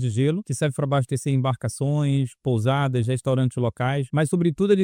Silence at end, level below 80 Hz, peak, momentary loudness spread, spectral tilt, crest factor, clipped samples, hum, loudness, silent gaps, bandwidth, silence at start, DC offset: 0 s; -56 dBFS; -6 dBFS; 3 LU; -7 dB/octave; 16 dB; under 0.1%; none; -23 LUFS; none; 14 kHz; 0 s; under 0.1%